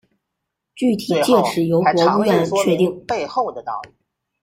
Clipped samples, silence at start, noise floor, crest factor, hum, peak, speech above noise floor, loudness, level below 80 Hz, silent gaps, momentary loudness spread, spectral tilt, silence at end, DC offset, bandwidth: under 0.1%; 0.75 s; -79 dBFS; 16 dB; none; -2 dBFS; 61 dB; -18 LUFS; -58 dBFS; none; 9 LU; -5.5 dB/octave; 0.55 s; under 0.1%; 16 kHz